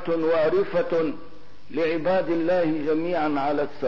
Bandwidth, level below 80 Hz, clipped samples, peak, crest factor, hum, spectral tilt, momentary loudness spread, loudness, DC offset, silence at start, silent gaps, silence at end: 6 kHz; -60 dBFS; under 0.1%; -12 dBFS; 10 dB; none; -8 dB/octave; 5 LU; -24 LUFS; 2%; 0 s; none; 0 s